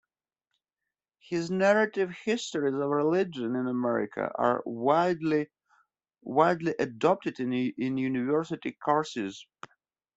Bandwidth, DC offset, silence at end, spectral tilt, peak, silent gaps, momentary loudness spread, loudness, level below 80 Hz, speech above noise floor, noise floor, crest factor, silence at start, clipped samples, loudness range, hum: 8.2 kHz; under 0.1%; 0.75 s; -6 dB/octave; -8 dBFS; none; 9 LU; -28 LUFS; -72 dBFS; 62 dB; -89 dBFS; 20 dB; 1.3 s; under 0.1%; 2 LU; none